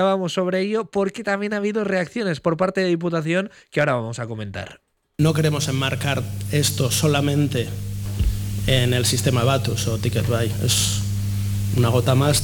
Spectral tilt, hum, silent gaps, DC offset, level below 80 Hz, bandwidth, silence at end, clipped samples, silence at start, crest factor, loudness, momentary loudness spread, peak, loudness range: -5 dB/octave; none; none; under 0.1%; -36 dBFS; 20 kHz; 0 s; under 0.1%; 0 s; 14 dB; -21 LUFS; 7 LU; -6 dBFS; 3 LU